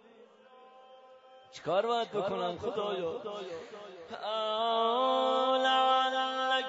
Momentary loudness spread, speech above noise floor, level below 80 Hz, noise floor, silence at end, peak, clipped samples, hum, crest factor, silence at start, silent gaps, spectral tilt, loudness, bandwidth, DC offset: 16 LU; 25 dB; -78 dBFS; -58 dBFS; 0 s; -16 dBFS; under 0.1%; none; 16 dB; 0.65 s; none; -0.5 dB/octave; -30 LUFS; 7.6 kHz; under 0.1%